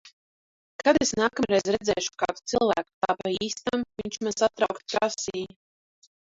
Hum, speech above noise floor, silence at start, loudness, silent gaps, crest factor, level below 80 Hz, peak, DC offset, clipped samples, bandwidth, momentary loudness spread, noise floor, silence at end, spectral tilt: none; over 64 dB; 0.05 s; -26 LUFS; 0.13-0.79 s, 2.94-3.01 s; 20 dB; -58 dBFS; -6 dBFS; under 0.1%; under 0.1%; 8 kHz; 9 LU; under -90 dBFS; 0.95 s; -3 dB/octave